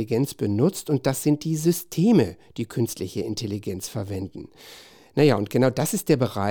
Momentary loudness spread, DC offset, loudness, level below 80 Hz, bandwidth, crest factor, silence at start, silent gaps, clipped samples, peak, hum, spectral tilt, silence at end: 13 LU; under 0.1%; -24 LUFS; -60 dBFS; 19.5 kHz; 18 dB; 0 s; none; under 0.1%; -6 dBFS; none; -6 dB/octave; 0 s